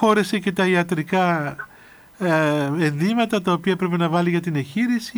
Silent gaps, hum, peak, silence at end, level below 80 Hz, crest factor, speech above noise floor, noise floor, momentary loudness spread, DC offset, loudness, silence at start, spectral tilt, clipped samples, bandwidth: none; none; -6 dBFS; 0 s; -62 dBFS; 14 dB; 27 dB; -47 dBFS; 6 LU; under 0.1%; -21 LUFS; 0 s; -6.5 dB/octave; under 0.1%; over 20 kHz